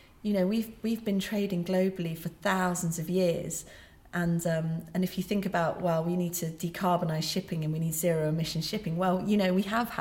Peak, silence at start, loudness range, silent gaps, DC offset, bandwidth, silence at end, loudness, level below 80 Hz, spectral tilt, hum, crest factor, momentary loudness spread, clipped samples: -14 dBFS; 0.25 s; 2 LU; none; under 0.1%; 17 kHz; 0 s; -30 LUFS; -58 dBFS; -5.5 dB/octave; none; 16 dB; 5 LU; under 0.1%